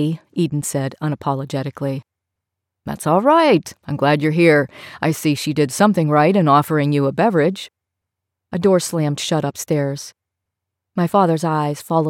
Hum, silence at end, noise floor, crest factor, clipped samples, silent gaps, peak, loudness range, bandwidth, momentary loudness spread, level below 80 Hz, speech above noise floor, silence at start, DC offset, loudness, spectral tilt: none; 0 s; -81 dBFS; 16 dB; under 0.1%; none; -2 dBFS; 6 LU; 16.5 kHz; 14 LU; -60 dBFS; 64 dB; 0 s; under 0.1%; -18 LUFS; -6 dB/octave